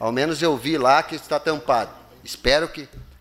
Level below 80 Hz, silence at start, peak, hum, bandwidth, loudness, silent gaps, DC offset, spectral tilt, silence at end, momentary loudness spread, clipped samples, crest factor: -42 dBFS; 0 s; -2 dBFS; none; 16 kHz; -21 LUFS; none; under 0.1%; -4 dB/octave; 0.15 s; 18 LU; under 0.1%; 20 dB